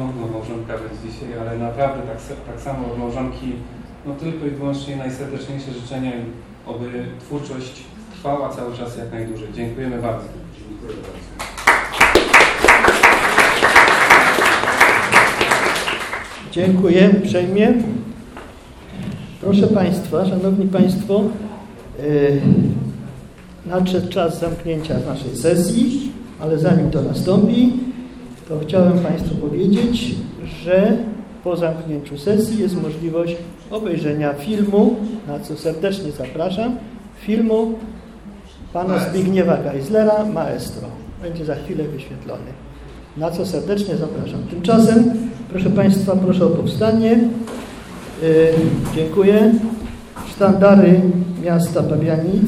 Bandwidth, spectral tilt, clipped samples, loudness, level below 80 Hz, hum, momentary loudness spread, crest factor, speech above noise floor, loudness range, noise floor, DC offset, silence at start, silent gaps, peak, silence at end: 15.5 kHz; -6 dB/octave; under 0.1%; -16 LUFS; -42 dBFS; none; 20 LU; 18 dB; 21 dB; 15 LU; -38 dBFS; under 0.1%; 0 s; none; 0 dBFS; 0 s